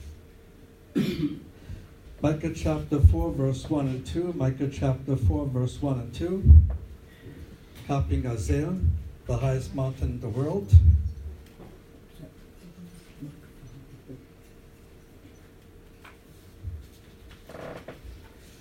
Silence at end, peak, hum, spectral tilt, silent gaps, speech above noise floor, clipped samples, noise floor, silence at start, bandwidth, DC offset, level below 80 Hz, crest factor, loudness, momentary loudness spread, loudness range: 0.35 s; -4 dBFS; none; -8 dB/octave; none; 28 dB; under 0.1%; -51 dBFS; 0 s; 9.8 kHz; under 0.1%; -32 dBFS; 24 dB; -25 LUFS; 27 LU; 23 LU